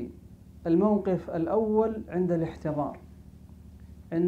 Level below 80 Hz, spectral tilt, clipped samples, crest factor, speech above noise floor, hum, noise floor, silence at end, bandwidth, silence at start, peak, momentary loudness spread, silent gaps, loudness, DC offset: -52 dBFS; -10 dB/octave; under 0.1%; 16 dB; 23 dB; none; -49 dBFS; 0 s; 7.6 kHz; 0 s; -12 dBFS; 12 LU; none; -28 LUFS; under 0.1%